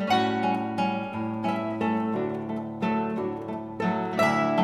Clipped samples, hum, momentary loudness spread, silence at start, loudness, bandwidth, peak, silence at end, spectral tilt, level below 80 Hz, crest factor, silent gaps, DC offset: under 0.1%; none; 8 LU; 0 s; -27 LUFS; 14 kHz; -12 dBFS; 0 s; -6.5 dB/octave; -62 dBFS; 16 dB; none; under 0.1%